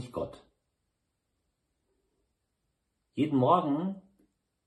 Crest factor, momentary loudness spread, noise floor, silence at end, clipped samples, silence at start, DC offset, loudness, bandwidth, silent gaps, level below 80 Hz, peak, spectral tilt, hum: 24 dB; 17 LU; -81 dBFS; 0.7 s; under 0.1%; 0 s; under 0.1%; -29 LUFS; 11.5 kHz; none; -70 dBFS; -10 dBFS; -8.5 dB/octave; none